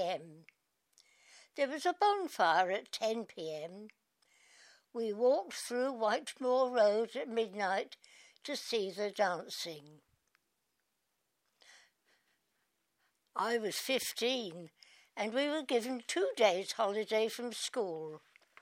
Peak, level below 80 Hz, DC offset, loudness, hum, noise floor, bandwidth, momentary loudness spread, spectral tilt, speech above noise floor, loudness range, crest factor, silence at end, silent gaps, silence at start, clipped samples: -14 dBFS; under -90 dBFS; under 0.1%; -34 LUFS; none; -83 dBFS; 16 kHz; 16 LU; -2.5 dB/octave; 48 dB; 7 LU; 22 dB; 0.45 s; none; 0 s; under 0.1%